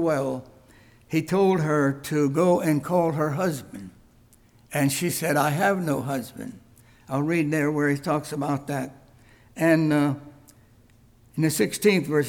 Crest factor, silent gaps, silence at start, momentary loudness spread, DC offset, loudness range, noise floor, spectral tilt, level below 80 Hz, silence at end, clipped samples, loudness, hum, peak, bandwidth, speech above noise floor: 18 dB; none; 0 s; 15 LU; under 0.1%; 3 LU; -56 dBFS; -6 dB/octave; -60 dBFS; 0 s; under 0.1%; -24 LUFS; none; -8 dBFS; 19 kHz; 33 dB